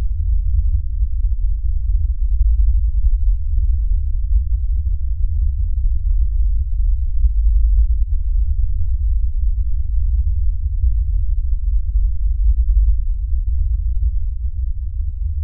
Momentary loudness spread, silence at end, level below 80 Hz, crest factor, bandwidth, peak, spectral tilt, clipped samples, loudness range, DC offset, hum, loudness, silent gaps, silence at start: 5 LU; 0 s; -16 dBFS; 10 dB; 0.2 kHz; -4 dBFS; -26.5 dB/octave; under 0.1%; 1 LU; 3%; none; -21 LUFS; none; 0 s